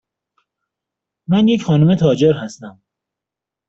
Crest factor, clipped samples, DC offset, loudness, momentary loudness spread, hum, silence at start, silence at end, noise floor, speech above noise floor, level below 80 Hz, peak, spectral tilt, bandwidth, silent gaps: 16 dB; under 0.1%; under 0.1%; -15 LUFS; 20 LU; none; 1.3 s; 1 s; -85 dBFS; 71 dB; -54 dBFS; -2 dBFS; -7.5 dB/octave; 7.8 kHz; none